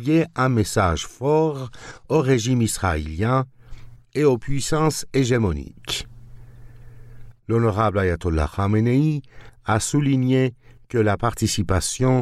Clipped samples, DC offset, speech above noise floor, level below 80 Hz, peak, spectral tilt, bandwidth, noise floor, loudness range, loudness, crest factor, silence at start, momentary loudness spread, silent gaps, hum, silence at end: under 0.1%; under 0.1%; 21 dB; -38 dBFS; -6 dBFS; -5.5 dB/octave; 15 kHz; -41 dBFS; 3 LU; -21 LUFS; 16 dB; 0 s; 9 LU; none; none; 0 s